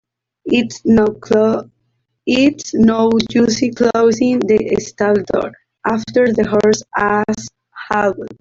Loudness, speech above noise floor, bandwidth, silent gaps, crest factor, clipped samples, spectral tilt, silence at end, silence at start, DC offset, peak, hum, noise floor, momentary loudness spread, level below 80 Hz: -15 LUFS; 53 dB; 7.8 kHz; none; 12 dB; under 0.1%; -5 dB/octave; 0.1 s; 0.45 s; under 0.1%; -2 dBFS; none; -67 dBFS; 9 LU; -46 dBFS